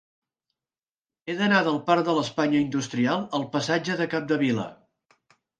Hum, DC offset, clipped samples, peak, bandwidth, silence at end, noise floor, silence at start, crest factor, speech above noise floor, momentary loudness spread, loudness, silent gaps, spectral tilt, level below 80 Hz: none; under 0.1%; under 0.1%; -6 dBFS; 9.4 kHz; 0.85 s; under -90 dBFS; 1.25 s; 20 dB; over 66 dB; 7 LU; -25 LUFS; none; -5.5 dB/octave; -68 dBFS